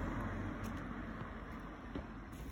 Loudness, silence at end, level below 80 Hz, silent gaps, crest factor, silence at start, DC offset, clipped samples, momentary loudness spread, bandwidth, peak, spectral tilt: -46 LUFS; 0 s; -50 dBFS; none; 14 dB; 0 s; under 0.1%; under 0.1%; 7 LU; 17 kHz; -30 dBFS; -7 dB/octave